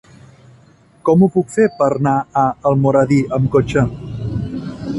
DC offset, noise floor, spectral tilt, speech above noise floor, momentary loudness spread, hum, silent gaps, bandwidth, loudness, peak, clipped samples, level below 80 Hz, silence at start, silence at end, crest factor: under 0.1%; -49 dBFS; -8 dB/octave; 34 dB; 11 LU; none; none; 11.5 kHz; -16 LUFS; 0 dBFS; under 0.1%; -40 dBFS; 1.05 s; 0 s; 16 dB